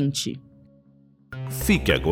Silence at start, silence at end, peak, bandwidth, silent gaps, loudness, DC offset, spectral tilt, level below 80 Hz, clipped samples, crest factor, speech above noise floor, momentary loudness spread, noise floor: 0 s; 0 s; -8 dBFS; 18 kHz; none; -24 LUFS; under 0.1%; -4.5 dB/octave; -38 dBFS; under 0.1%; 18 dB; 33 dB; 20 LU; -56 dBFS